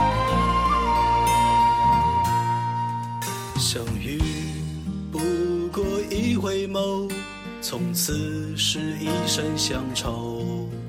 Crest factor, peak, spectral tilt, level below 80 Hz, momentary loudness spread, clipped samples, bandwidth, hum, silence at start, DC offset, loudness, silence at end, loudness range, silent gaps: 14 dB; -10 dBFS; -4.5 dB/octave; -38 dBFS; 10 LU; under 0.1%; 16.5 kHz; none; 0 s; under 0.1%; -24 LUFS; 0 s; 5 LU; none